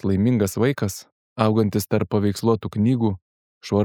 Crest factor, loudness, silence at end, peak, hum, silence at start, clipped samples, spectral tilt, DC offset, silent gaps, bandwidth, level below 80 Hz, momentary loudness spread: 18 dB; -22 LUFS; 0 s; -2 dBFS; none; 0.05 s; under 0.1%; -7 dB/octave; under 0.1%; 1.12-1.36 s, 3.22-3.61 s; 19.5 kHz; -54 dBFS; 14 LU